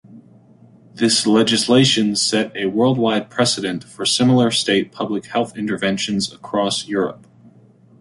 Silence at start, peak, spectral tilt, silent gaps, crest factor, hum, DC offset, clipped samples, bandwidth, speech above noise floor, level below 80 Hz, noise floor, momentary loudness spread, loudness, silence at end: 0.1 s; -2 dBFS; -4 dB/octave; none; 16 dB; none; under 0.1%; under 0.1%; 11.5 kHz; 31 dB; -58 dBFS; -49 dBFS; 9 LU; -18 LUFS; 0.85 s